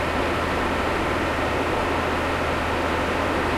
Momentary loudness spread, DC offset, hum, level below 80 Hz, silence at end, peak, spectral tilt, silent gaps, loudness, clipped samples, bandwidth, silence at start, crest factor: 0 LU; under 0.1%; none; -38 dBFS; 0 s; -10 dBFS; -5 dB/octave; none; -23 LUFS; under 0.1%; 16 kHz; 0 s; 14 dB